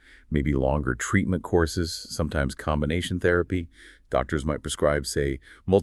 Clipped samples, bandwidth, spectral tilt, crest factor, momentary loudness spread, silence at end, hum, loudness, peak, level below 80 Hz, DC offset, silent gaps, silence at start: under 0.1%; 13.5 kHz; -5.5 dB/octave; 20 dB; 6 LU; 0 s; none; -26 LUFS; -6 dBFS; -36 dBFS; under 0.1%; none; 0.3 s